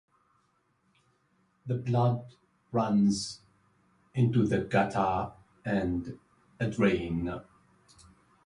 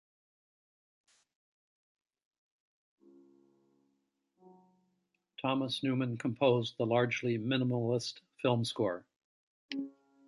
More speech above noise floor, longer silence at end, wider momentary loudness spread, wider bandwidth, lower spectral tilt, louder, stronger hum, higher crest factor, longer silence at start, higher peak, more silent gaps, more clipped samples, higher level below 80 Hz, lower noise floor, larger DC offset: second, 44 dB vs 49 dB; first, 1.05 s vs 0.4 s; first, 15 LU vs 12 LU; about the same, 11 kHz vs 11.5 kHz; about the same, -7 dB/octave vs -6 dB/octave; first, -30 LUFS vs -33 LUFS; neither; about the same, 20 dB vs 22 dB; second, 1.65 s vs 5.4 s; first, -10 dBFS vs -16 dBFS; second, none vs 9.16-9.69 s; neither; first, -54 dBFS vs -78 dBFS; second, -72 dBFS vs -81 dBFS; neither